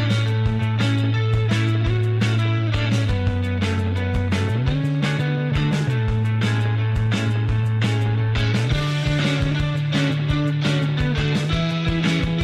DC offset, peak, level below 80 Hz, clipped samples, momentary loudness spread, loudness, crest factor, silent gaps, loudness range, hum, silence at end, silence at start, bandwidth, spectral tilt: under 0.1%; -8 dBFS; -34 dBFS; under 0.1%; 2 LU; -21 LUFS; 10 dB; none; 1 LU; none; 0 s; 0 s; 10.5 kHz; -6.5 dB/octave